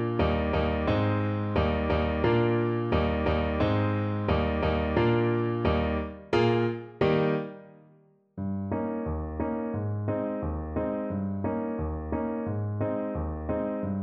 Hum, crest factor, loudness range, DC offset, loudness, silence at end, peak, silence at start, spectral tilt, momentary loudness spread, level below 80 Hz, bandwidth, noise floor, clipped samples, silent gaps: none; 16 dB; 5 LU; under 0.1%; -28 LUFS; 0 s; -10 dBFS; 0 s; -9 dB/octave; 8 LU; -38 dBFS; 6.6 kHz; -60 dBFS; under 0.1%; none